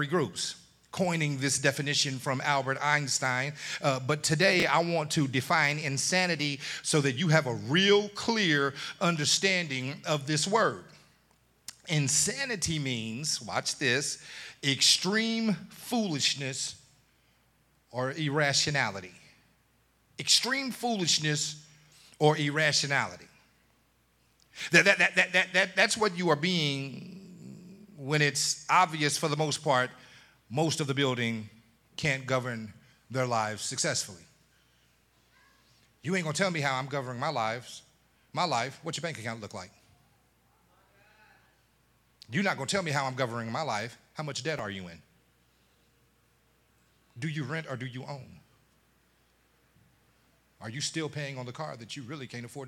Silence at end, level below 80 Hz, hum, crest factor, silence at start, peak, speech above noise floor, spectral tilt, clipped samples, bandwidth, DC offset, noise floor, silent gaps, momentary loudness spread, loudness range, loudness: 0 s; -70 dBFS; none; 26 dB; 0 s; -6 dBFS; 39 dB; -3 dB/octave; under 0.1%; 15.5 kHz; under 0.1%; -68 dBFS; none; 16 LU; 14 LU; -28 LUFS